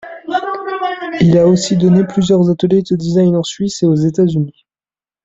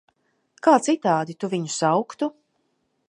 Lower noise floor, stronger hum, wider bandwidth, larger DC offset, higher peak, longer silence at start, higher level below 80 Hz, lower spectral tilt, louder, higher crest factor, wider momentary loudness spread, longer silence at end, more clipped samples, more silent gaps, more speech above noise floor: first, under -90 dBFS vs -71 dBFS; neither; second, 7.8 kHz vs 11.5 kHz; neither; first, 0 dBFS vs -4 dBFS; second, 0.05 s vs 0.65 s; first, -46 dBFS vs -78 dBFS; first, -7 dB/octave vs -5 dB/octave; first, -13 LUFS vs -22 LUFS; second, 12 dB vs 20 dB; about the same, 9 LU vs 10 LU; about the same, 0.75 s vs 0.8 s; neither; neither; first, over 78 dB vs 50 dB